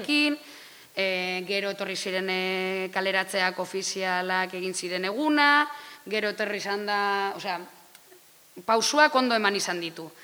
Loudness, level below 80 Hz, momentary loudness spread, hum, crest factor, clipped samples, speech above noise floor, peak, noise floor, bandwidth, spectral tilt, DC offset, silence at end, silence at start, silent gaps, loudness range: -26 LUFS; -80 dBFS; 12 LU; none; 22 dB; under 0.1%; 28 dB; -6 dBFS; -54 dBFS; over 20 kHz; -2.5 dB/octave; under 0.1%; 0 s; 0 s; none; 3 LU